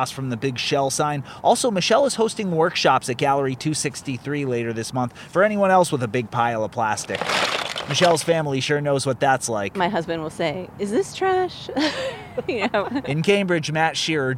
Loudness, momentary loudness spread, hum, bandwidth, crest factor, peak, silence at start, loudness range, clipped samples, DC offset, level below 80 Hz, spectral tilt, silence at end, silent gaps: -22 LUFS; 8 LU; none; 16 kHz; 18 dB; -4 dBFS; 0 s; 3 LU; under 0.1%; under 0.1%; -56 dBFS; -4 dB/octave; 0 s; none